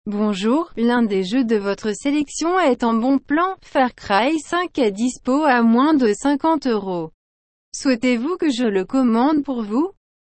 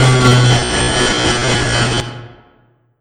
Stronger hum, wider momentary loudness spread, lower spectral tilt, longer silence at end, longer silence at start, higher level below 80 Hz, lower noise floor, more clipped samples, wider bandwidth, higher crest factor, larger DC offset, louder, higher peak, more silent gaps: neither; second, 7 LU vs 10 LU; about the same, -5 dB/octave vs -4 dB/octave; second, 0.3 s vs 0.7 s; about the same, 0.05 s vs 0 s; second, -54 dBFS vs -30 dBFS; first, under -90 dBFS vs -53 dBFS; neither; second, 8.8 kHz vs 11.5 kHz; about the same, 14 dB vs 14 dB; neither; second, -19 LUFS vs -12 LUFS; second, -6 dBFS vs 0 dBFS; first, 7.14-7.72 s vs none